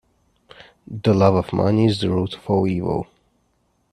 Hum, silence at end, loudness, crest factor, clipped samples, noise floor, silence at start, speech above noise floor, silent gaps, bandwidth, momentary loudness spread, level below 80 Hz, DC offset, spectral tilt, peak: none; 0.9 s; -20 LUFS; 20 dB; under 0.1%; -66 dBFS; 0.9 s; 47 dB; none; 11 kHz; 10 LU; -50 dBFS; under 0.1%; -8 dB/octave; 0 dBFS